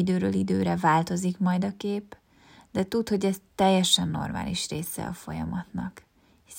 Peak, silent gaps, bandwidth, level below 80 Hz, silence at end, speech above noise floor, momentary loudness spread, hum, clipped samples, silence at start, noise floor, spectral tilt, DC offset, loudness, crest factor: -6 dBFS; none; 16.5 kHz; -56 dBFS; 0 s; 29 dB; 12 LU; none; under 0.1%; 0 s; -56 dBFS; -5 dB/octave; under 0.1%; -27 LUFS; 20 dB